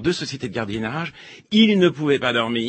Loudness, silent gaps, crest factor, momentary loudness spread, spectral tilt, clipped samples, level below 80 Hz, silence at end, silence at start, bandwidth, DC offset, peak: -20 LUFS; none; 18 dB; 11 LU; -5.5 dB/octave; under 0.1%; -54 dBFS; 0 s; 0 s; 8.8 kHz; under 0.1%; -2 dBFS